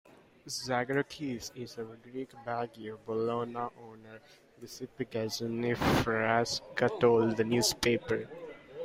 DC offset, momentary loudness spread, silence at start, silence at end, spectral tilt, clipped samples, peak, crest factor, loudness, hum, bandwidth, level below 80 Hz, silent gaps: under 0.1%; 17 LU; 0.45 s; 0 s; -4.5 dB/octave; under 0.1%; -12 dBFS; 20 dB; -32 LUFS; none; 16 kHz; -58 dBFS; none